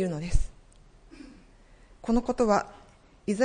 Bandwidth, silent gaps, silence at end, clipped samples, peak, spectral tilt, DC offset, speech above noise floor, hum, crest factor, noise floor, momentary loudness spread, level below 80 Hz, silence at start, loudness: 10 kHz; none; 0 s; under 0.1%; -8 dBFS; -6.5 dB/octave; under 0.1%; 30 dB; none; 20 dB; -55 dBFS; 25 LU; -36 dBFS; 0 s; -28 LUFS